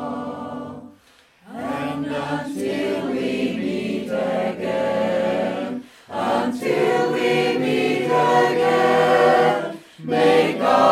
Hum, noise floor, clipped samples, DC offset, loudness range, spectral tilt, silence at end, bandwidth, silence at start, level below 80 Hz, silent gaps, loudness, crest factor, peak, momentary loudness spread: none; -54 dBFS; under 0.1%; under 0.1%; 8 LU; -5.5 dB/octave; 0 s; 15 kHz; 0 s; -62 dBFS; none; -20 LUFS; 18 dB; -2 dBFS; 15 LU